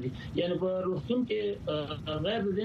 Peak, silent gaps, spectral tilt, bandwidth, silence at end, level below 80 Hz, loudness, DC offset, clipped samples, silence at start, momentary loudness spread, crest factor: -18 dBFS; none; -8 dB/octave; 8 kHz; 0 s; -54 dBFS; -32 LUFS; under 0.1%; under 0.1%; 0 s; 4 LU; 14 dB